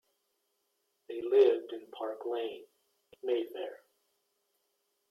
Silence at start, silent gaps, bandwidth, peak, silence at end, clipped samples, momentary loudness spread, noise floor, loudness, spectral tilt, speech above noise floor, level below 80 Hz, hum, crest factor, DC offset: 1.1 s; none; 12.5 kHz; -14 dBFS; 1.35 s; under 0.1%; 19 LU; -80 dBFS; -32 LUFS; -4.5 dB/octave; 48 dB; -88 dBFS; none; 22 dB; under 0.1%